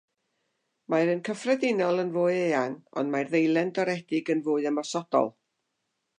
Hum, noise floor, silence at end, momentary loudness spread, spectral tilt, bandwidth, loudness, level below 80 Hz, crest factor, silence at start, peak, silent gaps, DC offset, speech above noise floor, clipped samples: none; -80 dBFS; 0.9 s; 5 LU; -5.5 dB/octave; 10 kHz; -27 LUFS; -84 dBFS; 18 dB; 0.9 s; -10 dBFS; none; under 0.1%; 54 dB; under 0.1%